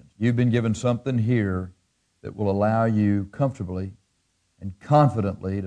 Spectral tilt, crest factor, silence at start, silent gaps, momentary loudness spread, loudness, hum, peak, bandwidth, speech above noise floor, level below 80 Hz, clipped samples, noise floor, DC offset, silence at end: -8 dB/octave; 18 dB; 0.2 s; none; 19 LU; -23 LUFS; none; -6 dBFS; 9.8 kHz; 48 dB; -56 dBFS; under 0.1%; -70 dBFS; under 0.1%; 0 s